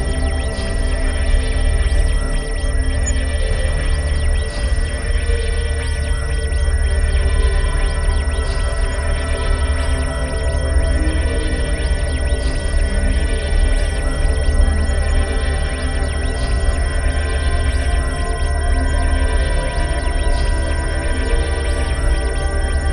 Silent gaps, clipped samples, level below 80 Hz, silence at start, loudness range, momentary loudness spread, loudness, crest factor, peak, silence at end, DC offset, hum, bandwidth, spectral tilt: none; under 0.1%; -18 dBFS; 0 s; 1 LU; 3 LU; -20 LUFS; 14 dB; -2 dBFS; 0 s; 0.4%; none; 11 kHz; -5 dB/octave